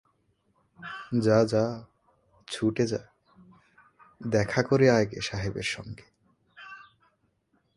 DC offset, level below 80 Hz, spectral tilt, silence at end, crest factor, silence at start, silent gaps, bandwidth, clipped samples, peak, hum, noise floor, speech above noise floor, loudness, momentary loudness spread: under 0.1%; -56 dBFS; -6 dB/octave; 0.95 s; 22 dB; 0.8 s; none; 11.5 kHz; under 0.1%; -6 dBFS; none; -72 dBFS; 46 dB; -27 LUFS; 24 LU